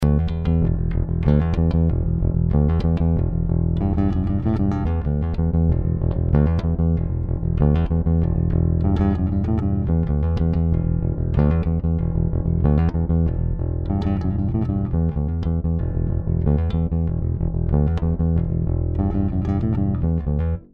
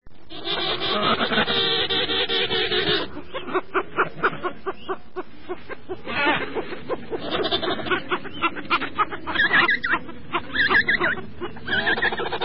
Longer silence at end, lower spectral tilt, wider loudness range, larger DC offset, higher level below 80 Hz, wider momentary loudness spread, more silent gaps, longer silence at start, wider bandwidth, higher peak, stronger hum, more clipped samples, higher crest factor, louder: first, 0.15 s vs 0 s; first, -11 dB/octave vs -8.5 dB/octave; second, 2 LU vs 6 LU; second, under 0.1% vs 2%; first, -24 dBFS vs -50 dBFS; second, 4 LU vs 15 LU; neither; about the same, 0 s vs 0 s; second, 4.7 kHz vs 5.8 kHz; about the same, -6 dBFS vs -6 dBFS; neither; neither; second, 12 dB vs 20 dB; about the same, -21 LUFS vs -22 LUFS